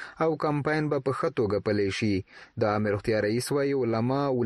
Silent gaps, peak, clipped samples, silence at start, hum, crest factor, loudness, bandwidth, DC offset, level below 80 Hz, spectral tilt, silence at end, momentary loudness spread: none; -12 dBFS; under 0.1%; 0 s; none; 14 dB; -27 LUFS; 12.5 kHz; under 0.1%; -58 dBFS; -6.5 dB/octave; 0 s; 2 LU